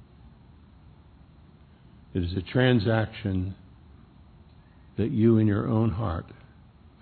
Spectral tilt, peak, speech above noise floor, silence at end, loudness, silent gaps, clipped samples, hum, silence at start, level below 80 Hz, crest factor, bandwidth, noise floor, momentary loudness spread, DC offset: -11 dB/octave; -8 dBFS; 29 dB; 0.7 s; -26 LUFS; none; under 0.1%; none; 2.15 s; -50 dBFS; 20 dB; 4.5 kHz; -53 dBFS; 15 LU; under 0.1%